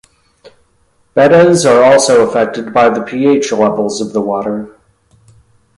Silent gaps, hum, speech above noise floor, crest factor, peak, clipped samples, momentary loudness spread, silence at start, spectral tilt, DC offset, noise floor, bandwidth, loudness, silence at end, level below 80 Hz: none; none; 45 dB; 12 dB; 0 dBFS; under 0.1%; 11 LU; 1.15 s; -4.5 dB/octave; under 0.1%; -55 dBFS; 11.5 kHz; -11 LUFS; 1.1 s; -52 dBFS